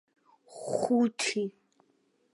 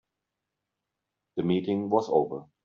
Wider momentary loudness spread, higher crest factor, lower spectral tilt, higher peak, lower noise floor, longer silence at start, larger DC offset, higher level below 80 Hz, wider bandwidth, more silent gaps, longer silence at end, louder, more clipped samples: first, 16 LU vs 9 LU; about the same, 18 dB vs 20 dB; second, -4 dB/octave vs -7 dB/octave; second, -14 dBFS vs -10 dBFS; second, -71 dBFS vs -85 dBFS; second, 0.5 s vs 1.35 s; neither; second, -82 dBFS vs -72 dBFS; first, 11.5 kHz vs 7.4 kHz; neither; first, 0.85 s vs 0.2 s; second, -30 LUFS vs -27 LUFS; neither